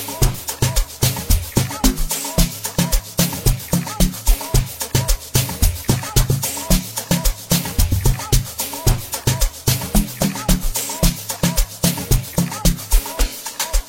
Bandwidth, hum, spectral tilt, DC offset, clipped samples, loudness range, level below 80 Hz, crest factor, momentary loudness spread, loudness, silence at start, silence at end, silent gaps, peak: 16.5 kHz; none; -4 dB/octave; 0.2%; under 0.1%; 1 LU; -22 dBFS; 18 dB; 3 LU; -19 LUFS; 0 s; 0 s; none; 0 dBFS